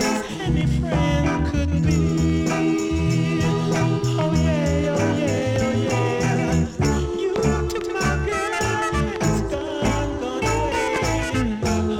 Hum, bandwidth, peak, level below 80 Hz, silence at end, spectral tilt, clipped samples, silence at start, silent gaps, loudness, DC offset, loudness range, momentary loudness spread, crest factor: none; 15.5 kHz; -8 dBFS; -32 dBFS; 0 s; -6 dB/octave; under 0.1%; 0 s; none; -22 LUFS; under 0.1%; 2 LU; 3 LU; 14 dB